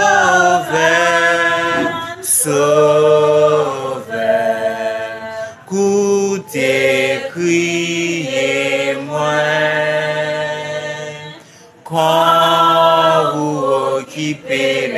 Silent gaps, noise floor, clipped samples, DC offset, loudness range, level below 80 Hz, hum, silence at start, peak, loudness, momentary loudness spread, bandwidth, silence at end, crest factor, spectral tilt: none; -41 dBFS; under 0.1%; under 0.1%; 5 LU; -60 dBFS; none; 0 s; -2 dBFS; -14 LUFS; 11 LU; 14.5 kHz; 0 s; 14 dB; -3.5 dB/octave